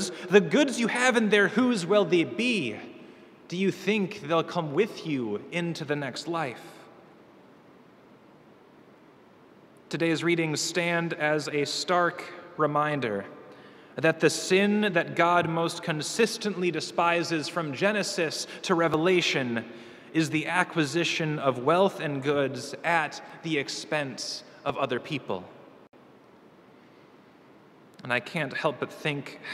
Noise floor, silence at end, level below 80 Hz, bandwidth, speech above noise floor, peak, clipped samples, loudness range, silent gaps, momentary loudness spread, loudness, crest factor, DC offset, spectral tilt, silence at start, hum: -55 dBFS; 0 s; -74 dBFS; 15 kHz; 28 dB; -4 dBFS; under 0.1%; 10 LU; none; 11 LU; -27 LUFS; 24 dB; under 0.1%; -4.5 dB/octave; 0 s; none